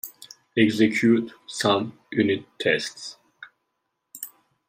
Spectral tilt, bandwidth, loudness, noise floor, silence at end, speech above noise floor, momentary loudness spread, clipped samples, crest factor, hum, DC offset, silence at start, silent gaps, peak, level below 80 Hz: -4.5 dB/octave; 16 kHz; -23 LUFS; -78 dBFS; 0.4 s; 55 dB; 19 LU; under 0.1%; 18 dB; none; under 0.1%; 0.05 s; none; -6 dBFS; -68 dBFS